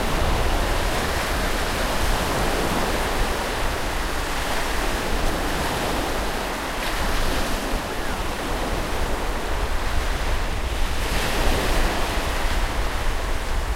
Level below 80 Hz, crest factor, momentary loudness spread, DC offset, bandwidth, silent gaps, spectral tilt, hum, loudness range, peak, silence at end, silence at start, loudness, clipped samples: -26 dBFS; 16 dB; 4 LU; under 0.1%; 16 kHz; none; -4 dB/octave; none; 3 LU; -6 dBFS; 0 s; 0 s; -25 LUFS; under 0.1%